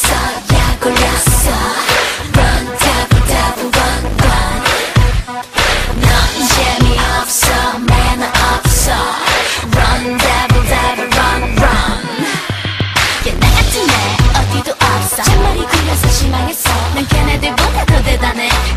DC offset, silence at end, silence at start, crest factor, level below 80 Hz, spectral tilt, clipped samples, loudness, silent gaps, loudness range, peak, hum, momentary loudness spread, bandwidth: under 0.1%; 0 s; 0 s; 12 dB; -16 dBFS; -3.5 dB/octave; under 0.1%; -12 LUFS; none; 1 LU; 0 dBFS; none; 3 LU; 16 kHz